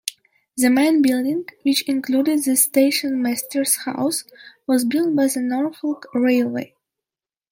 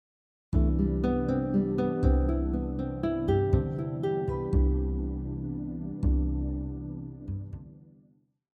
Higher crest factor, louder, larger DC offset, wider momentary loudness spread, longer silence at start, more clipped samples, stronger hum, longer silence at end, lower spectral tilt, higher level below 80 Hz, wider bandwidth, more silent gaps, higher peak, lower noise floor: about the same, 18 dB vs 16 dB; first, -19 LUFS vs -29 LUFS; neither; about the same, 10 LU vs 12 LU; second, 0.05 s vs 0.5 s; neither; neither; first, 0.85 s vs 0.7 s; second, -2.5 dB/octave vs -10.5 dB/octave; second, -70 dBFS vs -32 dBFS; first, 17 kHz vs 4.6 kHz; neither; first, -2 dBFS vs -12 dBFS; first, under -90 dBFS vs -63 dBFS